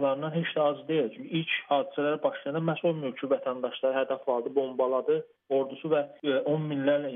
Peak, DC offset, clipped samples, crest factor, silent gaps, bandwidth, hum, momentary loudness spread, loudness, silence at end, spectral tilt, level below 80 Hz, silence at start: -12 dBFS; under 0.1%; under 0.1%; 16 dB; none; 3.8 kHz; none; 3 LU; -29 LUFS; 0 s; -4.5 dB/octave; -88 dBFS; 0 s